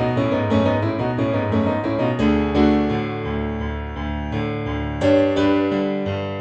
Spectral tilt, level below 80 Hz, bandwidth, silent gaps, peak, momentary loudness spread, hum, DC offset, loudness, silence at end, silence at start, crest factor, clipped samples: -8 dB/octave; -34 dBFS; 8 kHz; none; -4 dBFS; 8 LU; none; under 0.1%; -21 LUFS; 0 s; 0 s; 16 dB; under 0.1%